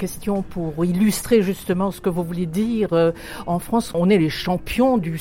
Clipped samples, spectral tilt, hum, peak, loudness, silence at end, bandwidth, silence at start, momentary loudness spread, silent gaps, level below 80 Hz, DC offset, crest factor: under 0.1%; -6 dB/octave; none; -6 dBFS; -21 LUFS; 0 s; 17 kHz; 0 s; 7 LU; none; -42 dBFS; under 0.1%; 16 dB